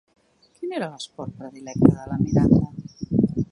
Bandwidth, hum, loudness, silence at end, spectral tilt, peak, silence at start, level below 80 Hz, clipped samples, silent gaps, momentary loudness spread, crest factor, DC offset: 11 kHz; none; -22 LUFS; 0.05 s; -8 dB/octave; 0 dBFS; 0.6 s; -42 dBFS; under 0.1%; none; 17 LU; 22 dB; under 0.1%